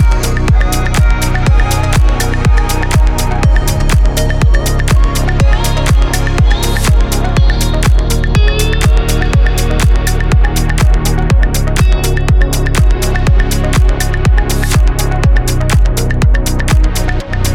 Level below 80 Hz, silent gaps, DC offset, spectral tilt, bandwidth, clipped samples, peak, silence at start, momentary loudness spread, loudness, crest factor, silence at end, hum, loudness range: -10 dBFS; none; under 0.1%; -5 dB/octave; 16 kHz; under 0.1%; 0 dBFS; 0 s; 2 LU; -12 LUFS; 8 dB; 0 s; none; 0 LU